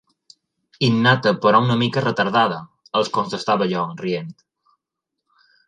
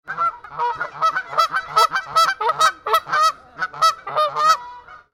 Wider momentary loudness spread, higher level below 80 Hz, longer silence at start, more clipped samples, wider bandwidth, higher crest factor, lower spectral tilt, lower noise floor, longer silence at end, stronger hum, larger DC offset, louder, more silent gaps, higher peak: first, 10 LU vs 7 LU; about the same, -62 dBFS vs -60 dBFS; first, 0.8 s vs 0.05 s; neither; second, 10 kHz vs 17 kHz; about the same, 20 dB vs 18 dB; first, -6 dB/octave vs -0.5 dB/octave; first, -82 dBFS vs -40 dBFS; first, 1.35 s vs 0.15 s; neither; neither; about the same, -19 LUFS vs -19 LUFS; neither; about the same, -2 dBFS vs -2 dBFS